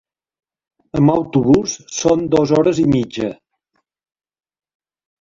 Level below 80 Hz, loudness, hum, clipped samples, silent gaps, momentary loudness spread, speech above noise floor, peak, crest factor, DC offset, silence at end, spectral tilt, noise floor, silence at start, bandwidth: -46 dBFS; -16 LUFS; none; under 0.1%; none; 10 LU; 55 dB; -2 dBFS; 16 dB; under 0.1%; 1.9 s; -6 dB/octave; -70 dBFS; 0.95 s; 7.6 kHz